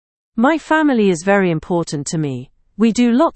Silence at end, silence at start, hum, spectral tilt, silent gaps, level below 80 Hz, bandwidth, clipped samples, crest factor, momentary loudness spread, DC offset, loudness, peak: 0.05 s; 0.35 s; none; -5.5 dB/octave; none; -50 dBFS; 8.8 kHz; under 0.1%; 16 dB; 9 LU; under 0.1%; -16 LUFS; 0 dBFS